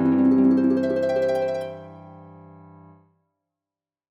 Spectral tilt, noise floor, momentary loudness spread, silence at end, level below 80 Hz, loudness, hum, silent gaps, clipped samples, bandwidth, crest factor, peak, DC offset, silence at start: -8.5 dB/octave; under -90 dBFS; 19 LU; 1.85 s; -74 dBFS; -21 LUFS; none; none; under 0.1%; 6.4 kHz; 14 dB; -10 dBFS; under 0.1%; 0 s